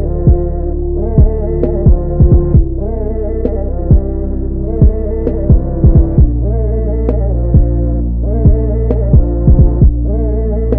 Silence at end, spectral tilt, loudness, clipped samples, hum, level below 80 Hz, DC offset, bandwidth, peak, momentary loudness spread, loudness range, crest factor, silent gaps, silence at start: 0 s; -14.5 dB/octave; -13 LUFS; 0.1%; none; -12 dBFS; under 0.1%; 2.1 kHz; 0 dBFS; 8 LU; 2 LU; 10 dB; none; 0 s